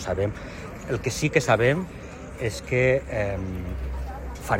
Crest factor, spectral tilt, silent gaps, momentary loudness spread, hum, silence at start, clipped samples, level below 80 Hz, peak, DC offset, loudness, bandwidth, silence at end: 20 dB; -5.5 dB/octave; none; 16 LU; none; 0 s; under 0.1%; -38 dBFS; -4 dBFS; under 0.1%; -25 LUFS; 16 kHz; 0 s